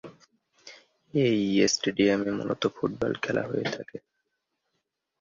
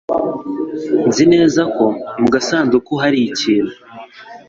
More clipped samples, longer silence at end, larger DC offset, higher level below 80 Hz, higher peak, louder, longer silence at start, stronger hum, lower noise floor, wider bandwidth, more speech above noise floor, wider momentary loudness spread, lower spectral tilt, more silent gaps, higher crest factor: neither; first, 1.2 s vs 0.1 s; neither; second, -62 dBFS vs -52 dBFS; second, -8 dBFS vs -2 dBFS; second, -27 LUFS vs -15 LUFS; about the same, 0.05 s vs 0.1 s; neither; first, -80 dBFS vs -36 dBFS; about the same, 7.6 kHz vs 7.8 kHz; first, 54 dB vs 22 dB; about the same, 10 LU vs 12 LU; about the same, -4.5 dB/octave vs -5 dB/octave; neither; first, 20 dB vs 14 dB